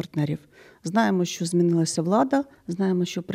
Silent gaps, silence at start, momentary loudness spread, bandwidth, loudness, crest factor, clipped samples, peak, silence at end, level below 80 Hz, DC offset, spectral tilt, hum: none; 0 s; 9 LU; 15 kHz; -24 LUFS; 18 dB; under 0.1%; -6 dBFS; 0 s; -66 dBFS; under 0.1%; -6 dB/octave; none